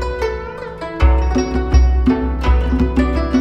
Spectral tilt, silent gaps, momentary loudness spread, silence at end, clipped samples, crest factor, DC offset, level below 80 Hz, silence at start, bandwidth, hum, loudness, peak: -8 dB/octave; none; 12 LU; 0 s; under 0.1%; 14 dB; under 0.1%; -16 dBFS; 0 s; 6.2 kHz; none; -17 LUFS; 0 dBFS